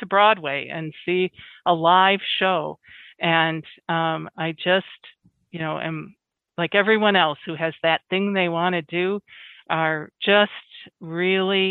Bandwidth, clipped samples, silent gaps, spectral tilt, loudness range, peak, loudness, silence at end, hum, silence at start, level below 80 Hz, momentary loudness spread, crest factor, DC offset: 4.4 kHz; under 0.1%; none; -8 dB/octave; 4 LU; -2 dBFS; -21 LUFS; 0 s; none; 0 s; -72 dBFS; 14 LU; 20 dB; under 0.1%